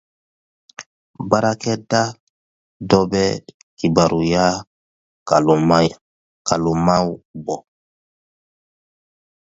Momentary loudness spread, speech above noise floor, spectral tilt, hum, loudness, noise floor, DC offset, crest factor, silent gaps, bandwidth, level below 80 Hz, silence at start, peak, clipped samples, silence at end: 15 LU; over 73 dB; -5.5 dB/octave; none; -18 LUFS; under -90 dBFS; under 0.1%; 20 dB; 0.86-1.14 s, 2.20-2.80 s, 3.54-3.77 s, 4.67-5.26 s, 6.01-6.45 s, 7.25-7.34 s; 8 kHz; -48 dBFS; 0.8 s; 0 dBFS; under 0.1%; 1.85 s